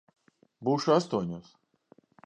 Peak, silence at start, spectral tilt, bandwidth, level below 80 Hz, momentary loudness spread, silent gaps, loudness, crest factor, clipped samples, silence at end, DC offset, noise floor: -10 dBFS; 0.6 s; -6.5 dB/octave; 9.6 kHz; -68 dBFS; 13 LU; none; -28 LUFS; 22 dB; under 0.1%; 0.85 s; under 0.1%; -63 dBFS